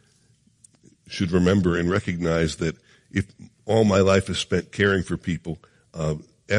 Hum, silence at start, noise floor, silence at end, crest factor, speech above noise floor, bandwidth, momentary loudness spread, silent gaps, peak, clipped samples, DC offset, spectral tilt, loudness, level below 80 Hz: none; 1.1 s; -61 dBFS; 0 s; 18 dB; 39 dB; 11 kHz; 17 LU; none; -6 dBFS; under 0.1%; under 0.1%; -6 dB/octave; -23 LUFS; -50 dBFS